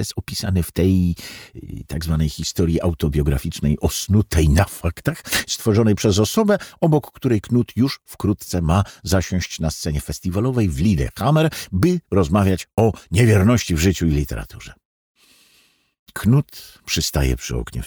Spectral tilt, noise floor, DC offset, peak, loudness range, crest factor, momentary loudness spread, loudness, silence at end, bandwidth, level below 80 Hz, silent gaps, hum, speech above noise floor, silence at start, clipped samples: -6 dB/octave; -58 dBFS; under 0.1%; -2 dBFS; 4 LU; 18 dB; 9 LU; -20 LUFS; 0 s; over 20 kHz; -32 dBFS; 14.85-15.15 s, 15.99-16.06 s; none; 39 dB; 0 s; under 0.1%